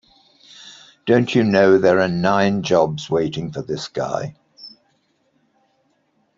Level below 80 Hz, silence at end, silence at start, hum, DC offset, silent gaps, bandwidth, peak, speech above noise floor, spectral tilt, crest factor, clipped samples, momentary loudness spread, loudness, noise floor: -58 dBFS; 1.7 s; 0.6 s; none; under 0.1%; none; 7.6 kHz; -2 dBFS; 47 dB; -6 dB/octave; 18 dB; under 0.1%; 26 LU; -18 LUFS; -65 dBFS